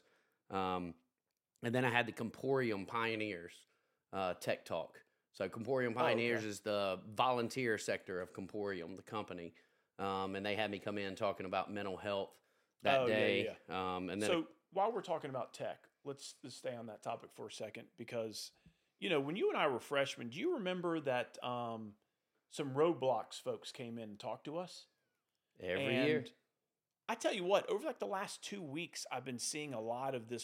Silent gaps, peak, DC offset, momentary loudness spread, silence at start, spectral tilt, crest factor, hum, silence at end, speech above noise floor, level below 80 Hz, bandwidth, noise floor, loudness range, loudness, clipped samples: none; -16 dBFS; under 0.1%; 13 LU; 0.5 s; -4.5 dB/octave; 24 dB; none; 0 s; over 51 dB; -84 dBFS; 16.5 kHz; under -90 dBFS; 5 LU; -39 LUFS; under 0.1%